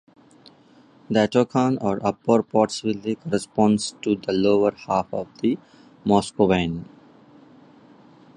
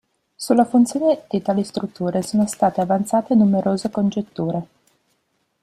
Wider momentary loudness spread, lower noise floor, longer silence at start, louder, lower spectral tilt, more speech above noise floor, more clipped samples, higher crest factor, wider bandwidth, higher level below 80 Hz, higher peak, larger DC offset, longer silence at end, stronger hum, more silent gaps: about the same, 7 LU vs 9 LU; second, -53 dBFS vs -69 dBFS; first, 1.1 s vs 0.4 s; about the same, -22 LUFS vs -20 LUFS; about the same, -6 dB/octave vs -6.5 dB/octave; second, 32 dB vs 50 dB; neither; about the same, 20 dB vs 16 dB; second, 11 kHz vs 14 kHz; first, -54 dBFS vs -60 dBFS; about the same, -2 dBFS vs -4 dBFS; neither; first, 1.5 s vs 1 s; neither; neither